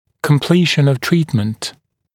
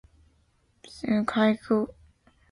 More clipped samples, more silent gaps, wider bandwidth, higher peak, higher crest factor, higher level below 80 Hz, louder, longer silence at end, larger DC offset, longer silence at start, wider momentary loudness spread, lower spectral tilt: neither; neither; first, 17.5 kHz vs 11 kHz; first, 0 dBFS vs -10 dBFS; about the same, 16 dB vs 18 dB; about the same, -56 dBFS vs -60 dBFS; first, -15 LUFS vs -26 LUFS; second, 0.45 s vs 0.6 s; neither; second, 0.25 s vs 0.9 s; second, 11 LU vs 14 LU; about the same, -6 dB/octave vs -6.5 dB/octave